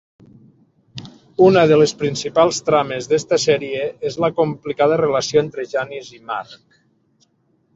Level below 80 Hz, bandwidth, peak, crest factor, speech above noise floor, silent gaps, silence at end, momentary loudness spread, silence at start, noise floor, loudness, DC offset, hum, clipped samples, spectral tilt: -58 dBFS; 8 kHz; -2 dBFS; 18 dB; 45 dB; none; 1.2 s; 16 LU; 0.95 s; -63 dBFS; -17 LUFS; under 0.1%; none; under 0.1%; -5 dB/octave